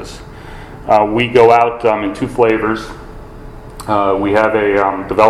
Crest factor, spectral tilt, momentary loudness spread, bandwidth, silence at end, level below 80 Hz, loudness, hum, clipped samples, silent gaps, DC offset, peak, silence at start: 14 dB; -6 dB/octave; 23 LU; 13.5 kHz; 0 s; -38 dBFS; -13 LUFS; none; 0.2%; none; under 0.1%; 0 dBFS; 0 s